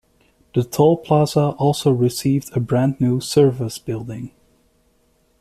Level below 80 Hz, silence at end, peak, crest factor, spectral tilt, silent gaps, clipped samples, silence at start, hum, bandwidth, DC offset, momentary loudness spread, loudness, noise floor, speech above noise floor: -52 dBFS; 1.1 s; -4 dBFS; 16 dB; -7 dB/octave; none; under 0.1%; 0.55 s; none; 14.5 kHz; under 0.1%; 12 LU; -19 LUFS; -61 dBFS; 43 dB